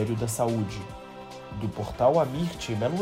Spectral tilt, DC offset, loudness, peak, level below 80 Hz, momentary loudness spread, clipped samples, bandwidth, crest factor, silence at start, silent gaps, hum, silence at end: -6 dB/octave; under 0.1%; -27 LUFS; -8 dBFS; -50 dBFS; 18 LU; under 0.1%; 16 kHz; 18 dB; 0 s; none; none; 0 s